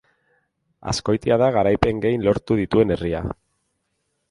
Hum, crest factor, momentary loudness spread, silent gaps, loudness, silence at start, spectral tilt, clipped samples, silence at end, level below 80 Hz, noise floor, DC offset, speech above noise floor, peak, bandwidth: none; 20 dB; 11 LU; none; -20 LUFS; 0.85 s; -6.5 dB/octave; under 0.1%; 0.95 s; -42 dBFS; -73 dBFS; under 0.1%; 53 dB; -2 dBFS; 11.5 kHz